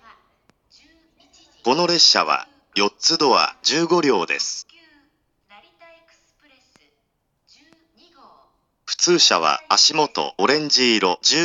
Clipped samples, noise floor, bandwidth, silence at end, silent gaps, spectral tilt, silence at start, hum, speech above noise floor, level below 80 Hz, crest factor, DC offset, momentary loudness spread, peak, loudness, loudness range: under 0.1%; -71 dBFS; 12.5 kHz; 0 s; none; -1.5 dB/octave; 1.65 s; none; 53 dB; -74 dBFS; 22 dB; under 0.1%; 11 LU; 0 dBFS; -17 LUFS; 10 LU